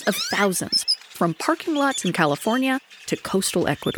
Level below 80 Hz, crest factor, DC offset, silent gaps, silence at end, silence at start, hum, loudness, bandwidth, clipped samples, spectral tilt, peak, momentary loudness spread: -58 dBFS; 20 dB; under 0.1%; none; 0 s; 0 s; none; -22 LUFS; over 20 kHz; under 0.1%; -3.5 dB/octave; -4 dBFS; 5 LU